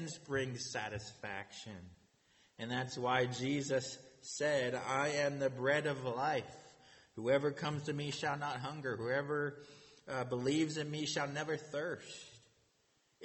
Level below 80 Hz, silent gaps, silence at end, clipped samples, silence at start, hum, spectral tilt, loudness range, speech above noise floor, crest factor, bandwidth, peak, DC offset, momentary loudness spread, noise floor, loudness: -74 dBFS; none; 0 s; under 0.1%; 0 s; none; -4.5 dB/octave; 4 LU; 38 dB; 20 dB; 8.4 kHz; -18 dBFS; under 0.1%; 16 LU; -76 dBFS; -38 LUFS